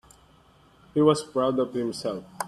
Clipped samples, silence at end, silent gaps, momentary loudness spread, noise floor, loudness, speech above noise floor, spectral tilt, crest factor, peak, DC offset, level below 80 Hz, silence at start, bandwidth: under 0.1%; 0 s; none; 10 LU; -57 dBFS; -25 LUFS; 33 dB; -6 dB/octave; 20 dB; -8 dBFS; under 0.1%; -62 dBFS; 0.95 s; 13.5 kHz